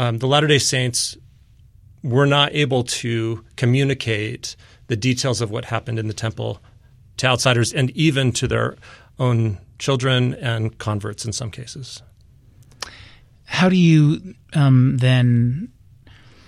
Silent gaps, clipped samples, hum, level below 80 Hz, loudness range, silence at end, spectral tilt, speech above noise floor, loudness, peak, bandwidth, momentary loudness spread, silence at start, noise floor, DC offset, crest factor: none; under 0.1%; none; -48 dBFS; 6 LU; 0.8 s; -5 dB/octave; 31 dB; -19 LUFS; -2 dBFS; 13.5 kHz; 16 LU; 0 s; -50 dBFS; under 0.1%; 18 dB